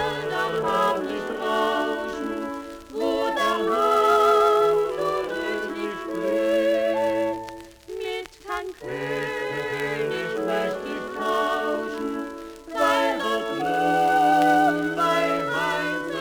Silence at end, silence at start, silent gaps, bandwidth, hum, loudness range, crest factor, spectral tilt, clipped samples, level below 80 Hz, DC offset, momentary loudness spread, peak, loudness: 0 s; 0 s; none; over 20 kHz; none; 7 LU; 18 dB; -4.5 dB/octave; under 0.1%; -56 dBFS; under 0.1%; 13 LU; -6 dBFS; -24 LUFS